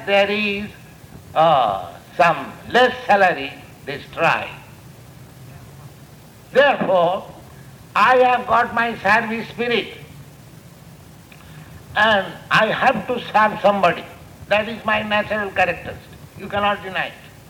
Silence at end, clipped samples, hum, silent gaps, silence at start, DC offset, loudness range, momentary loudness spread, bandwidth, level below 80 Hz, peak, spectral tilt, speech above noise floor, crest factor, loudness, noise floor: 0.2 s; under 0.1%; none; none; 0 s; under 0.1%; 5 LU; 16 LU; 19.5 kHz; -52 dBFS; -2 dBFS; -5 dB/octave; 25 dB; 18 dB; -18 LUFS; -43 dBFS